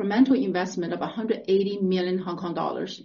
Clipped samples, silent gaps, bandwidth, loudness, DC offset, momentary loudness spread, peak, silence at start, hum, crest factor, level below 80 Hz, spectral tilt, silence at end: under 0.1%; none; 7.4 kHz; -25 LUFS; under 0.1%; 9 LU; -8 dBFS; 0 s; none; 16 dB; -70 dBFS; -5.5 dB/octave; 0 s